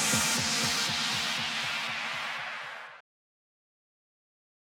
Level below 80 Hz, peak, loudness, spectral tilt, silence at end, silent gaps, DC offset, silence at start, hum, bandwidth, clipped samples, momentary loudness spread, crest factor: -66 dBFS; -14 dBFS; -29 LUFS; -1 dB/octave; 1.65 s; none; under 0.1%; 0 s; none; 19 kHz; under 0.1%; 14 LU; 18 dB